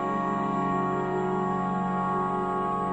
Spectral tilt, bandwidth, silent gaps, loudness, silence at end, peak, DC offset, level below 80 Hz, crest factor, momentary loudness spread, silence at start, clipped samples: -8 dB/octave; 8.6 kHz; none; -27 LUFS; 0 s; -16 dBFS; under 0.1%; -54 dBFS; 12 dB; 1 LU; 0 s; under 0.1%